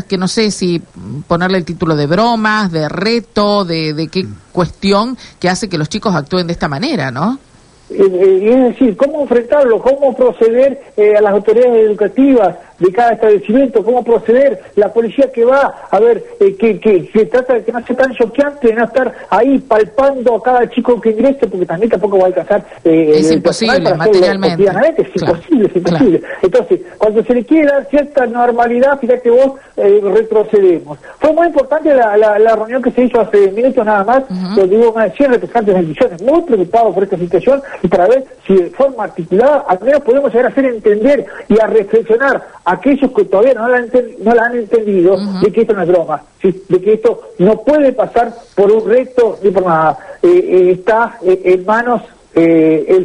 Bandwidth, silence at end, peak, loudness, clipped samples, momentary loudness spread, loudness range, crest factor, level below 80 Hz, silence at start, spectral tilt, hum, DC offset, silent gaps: 10.5 kHz; 0 s; 0 dBFS; -12 LUFS; under 0.1%; 6 LU; 3 LU; 10 dB; -44 dBFS; 0.1 s; -6.5 dB/octave; none; under 0.1%; none